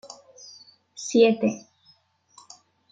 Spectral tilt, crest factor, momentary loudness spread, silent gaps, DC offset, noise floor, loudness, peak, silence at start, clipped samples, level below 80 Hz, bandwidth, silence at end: -4.5 dB/octave; 22 dB; 26 LU; none; under 0.1%; -61 dBFS; -22 LUFS; -6 dBFS; 1 s; under 0.1%; -76 dBFS; 9.2 kHz; 1.35 s